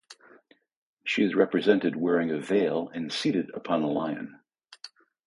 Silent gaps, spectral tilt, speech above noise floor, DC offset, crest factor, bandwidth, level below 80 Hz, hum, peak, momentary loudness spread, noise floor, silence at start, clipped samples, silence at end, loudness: 0.76-0.97 s; -6 dB/octave; 33 dB; under 0.1%; 20 dB; 11.5 kHz; -70 dBFS; none; -8 dBFS; 20 LU; -59 dBFS; 0.1 s; under 0.1%; 0.4 s; -27 LUFS